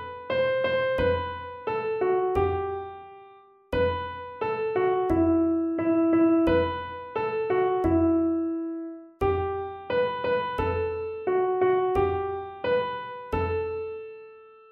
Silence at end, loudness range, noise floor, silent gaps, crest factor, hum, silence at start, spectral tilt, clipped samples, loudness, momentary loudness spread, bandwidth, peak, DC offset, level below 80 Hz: 0.2 s; 4 LU; -53 dBFS; none; 14 dB; none; 0 s; -8.5 dB/octave; under 0.1%; -26 LUFS; 12 LU; 5.2 kHz; -12 dBFS; under 0.1%; -46 dBFS